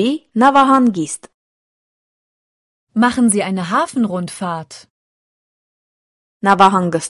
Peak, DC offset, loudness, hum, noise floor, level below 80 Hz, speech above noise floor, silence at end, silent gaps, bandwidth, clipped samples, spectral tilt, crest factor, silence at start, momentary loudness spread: 0 dBFS; under 0.1%; -15 LUFS; none; under -90 dBFS; -58 dBFS; over 75 dB; 0 s; 1.34-2.87 s, 4.90-6.40 s; 11.5 kHz; under 0.1%; -4.5 dB/octave; 18 dB; 0 s; 13 LU